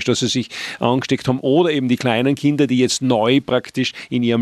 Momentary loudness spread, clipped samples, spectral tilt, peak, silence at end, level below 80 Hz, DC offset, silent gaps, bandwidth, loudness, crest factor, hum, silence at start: 6 LU; under 0.1%; -5 dB/octave; -2 dBFS; 0 s; -58 dBFS; under 0.1%; none; 13 kHz; -18 LUFS; 16 dB; none; 0 s